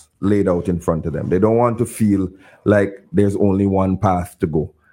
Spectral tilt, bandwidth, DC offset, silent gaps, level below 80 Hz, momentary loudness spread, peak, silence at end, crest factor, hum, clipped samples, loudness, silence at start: -8.5 dB/octave; 16.5 kHz; under 0.1%; none; -46 dBFS; 5 LU; 0 dBFS; 0.25 s; 16 dB; none; under 0.1%; -18 LUFS; 0.2 s